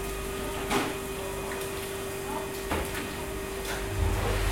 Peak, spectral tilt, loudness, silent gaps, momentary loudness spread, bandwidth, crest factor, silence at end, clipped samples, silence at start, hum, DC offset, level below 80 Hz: -14 dBFS; -4 dB/octave; -32 LUFS; none; 5 LU; 16.5 kHz; 16 dB; 0 s; under 0.1%; 0 s; none; under 0.1%; -38 dBFS